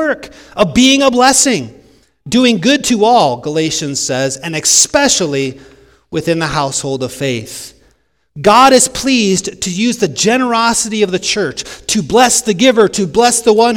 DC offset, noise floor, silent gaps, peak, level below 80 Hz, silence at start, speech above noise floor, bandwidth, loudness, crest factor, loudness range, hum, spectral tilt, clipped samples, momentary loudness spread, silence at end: under 0.1%; -56 dBFS; none; 0 dBFS; -42 dBFS; 0 s; 43 dB; over 20 kHz; -11 LUFS; 12 dB; 3 LU; none; -3 dB/octave; 0.5%; 11 LU; 0 s